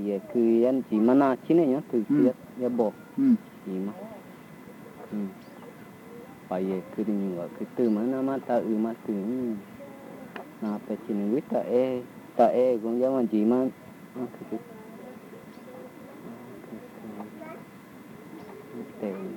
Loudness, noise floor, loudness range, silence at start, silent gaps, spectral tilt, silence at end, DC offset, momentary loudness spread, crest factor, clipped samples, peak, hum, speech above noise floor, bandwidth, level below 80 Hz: -27 LUFS; -47 dBFS; 17 LU; 0 s; none; -8.5 dB/octave; 0 s; under 0.1%; 22 LU; 20 dB; under 0.1%; -10 dBFS; none; 21 dB; 19 kHz; -74 dBFS